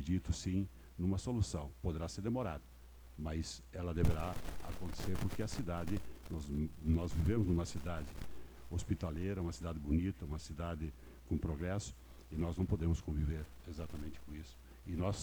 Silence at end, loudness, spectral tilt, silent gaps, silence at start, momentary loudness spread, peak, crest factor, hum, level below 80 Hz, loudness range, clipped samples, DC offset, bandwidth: 0 s; -40 LUFS; -6.5 dB/octave; none; 0 s; 13 LU; -18 dBFS; 22 dB; none; -46 dBFS; 3 LU; under 0.1%; under 0.1%; over 20 kHz